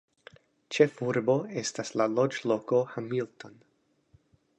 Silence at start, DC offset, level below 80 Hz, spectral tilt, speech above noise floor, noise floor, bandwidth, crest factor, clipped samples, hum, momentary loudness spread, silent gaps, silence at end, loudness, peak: 0.7 s; under 0.1%; -76 dBFS; -5 dB/octave; 38 dB; -67 dBFS; 10 kHz; 22 dB; under 0.1%; none; 11 LU; none; 1.1 s; -29 LUFS; -8 dBFS